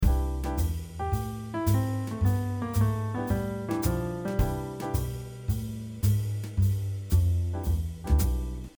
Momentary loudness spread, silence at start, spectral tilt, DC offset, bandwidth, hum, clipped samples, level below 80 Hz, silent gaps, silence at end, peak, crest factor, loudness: 6 LU; 0 s; -7 dB/octave; under 0.1%; over 20 kHz; none; under 0.1%; -32 dBFS; none; 0.1 s; -12 dBFS; 16 dB; -29 LUFS